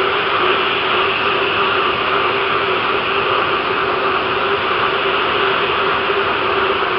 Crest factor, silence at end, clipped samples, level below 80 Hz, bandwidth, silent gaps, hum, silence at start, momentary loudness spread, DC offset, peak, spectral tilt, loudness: 14 dB; 0 s; under 0.1%; -46 dBFS; 5.6 kHz; none; none; 0 s; 2 LU; under 0.1%; -4 dBFS; -7 dB/octave; -15 LUFS